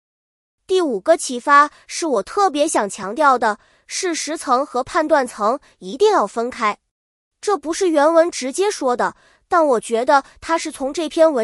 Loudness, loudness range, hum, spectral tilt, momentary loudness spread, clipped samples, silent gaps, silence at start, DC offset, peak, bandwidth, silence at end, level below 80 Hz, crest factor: -18 LUFS; 2 LU; none; -2.5 dB/octave; 10 LU; under 0.1%; 6.91-7.31 s; 0.7 s; under 0.1%; -2 dBFS; 13.5 kHz; 0 s; -58 dBFS; 16 dB